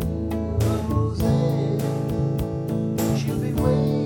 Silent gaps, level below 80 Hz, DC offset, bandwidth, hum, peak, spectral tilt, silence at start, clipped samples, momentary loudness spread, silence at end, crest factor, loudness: none; -36 dBFS; under 0.1%; over 20 kHz; none; -8 dBFS; -7.5 dB/octave; 0 s; under 0.1%; 5 LU; 0 s; 14 dB; -23 LUFS